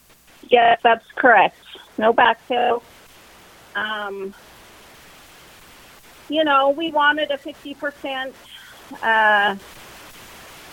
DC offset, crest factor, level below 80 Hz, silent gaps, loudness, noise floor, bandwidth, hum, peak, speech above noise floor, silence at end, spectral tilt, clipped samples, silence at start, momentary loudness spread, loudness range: under 0.1%; 20 dB; -60 dBFS; none; -18 LUFS; -48 dBFS; 17 kHz; none; -2 dBFS; 29 dB; 0 s; -3.5 dB/octave; under 0.1%; 0.5 s; 25 LU; 11 LU